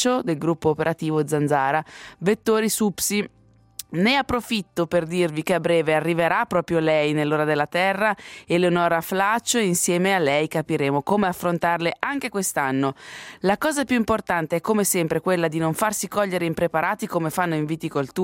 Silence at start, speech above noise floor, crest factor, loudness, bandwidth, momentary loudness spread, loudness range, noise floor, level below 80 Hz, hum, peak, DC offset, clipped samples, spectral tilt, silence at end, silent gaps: 0 s; 20 dB; 20 dB; -22 LUFS; 16.5 kHz; 6 LU; 2 LU; -42 dBFS; -56 dBFS; none; -2 dBFS; under 0.1%; under 0.1%; -4.5 dB/octave; 0 s; none